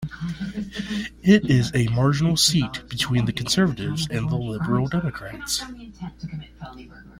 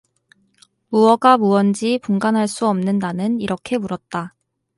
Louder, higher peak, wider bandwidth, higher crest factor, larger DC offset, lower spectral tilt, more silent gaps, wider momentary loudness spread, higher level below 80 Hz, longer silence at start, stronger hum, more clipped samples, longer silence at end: second, -22 LUFS vs -18 LUFS; second, -4 dBFS vs 0 dBFS; first, 16.5 kHz vs 11.5 kHz; about the same, 20 dB vs 18 dB; neither; about the same, -5 dB/octave vs -6 dB/octave; neither; first, 19 LU vs 13 LU; first, -46 dBFS vs -60 dBFS; second, 0 s vs 0.9 s; neither; neither; second, 0 s vs 0.5 s